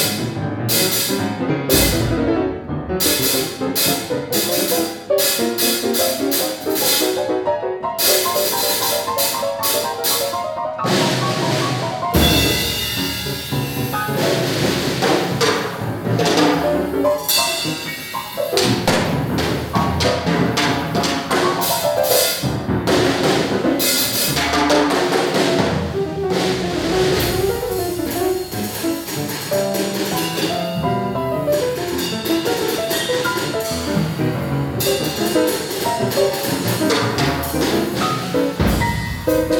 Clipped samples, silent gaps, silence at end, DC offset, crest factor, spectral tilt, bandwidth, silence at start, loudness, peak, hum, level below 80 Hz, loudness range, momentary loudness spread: under 0.1%; none; 0 s; under 0.1%; 18 dB; -3.5 dB/octave; over 20 kHz; 0 s; -18 LUFS; -2 dBFS; none; -38 dBFS; 3 LU; 7 LU